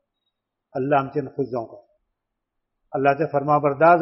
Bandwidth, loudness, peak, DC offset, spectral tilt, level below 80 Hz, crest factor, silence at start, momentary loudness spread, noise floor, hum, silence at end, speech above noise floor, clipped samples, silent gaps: 5.8 kHz; -22 LUFS; -2 dBFS; under 0.1%; -6.5 dB/octave; -66 dBFS; 20 dB; 0.75 s; 14 LU; -80 dBFS; none; 0 s; 60 dB; under 0.1%; none